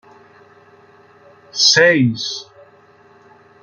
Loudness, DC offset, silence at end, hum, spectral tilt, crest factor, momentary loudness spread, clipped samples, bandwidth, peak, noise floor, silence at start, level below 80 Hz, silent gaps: -13 LUFS; under 0.1%; 1.2 s; none; -3 dB/octave; 20 dB; 18 LU; under 0.1%; 7.6 kHz; 0 dBFS; -49 dBFS; 1.55 s; -64 dBFS; none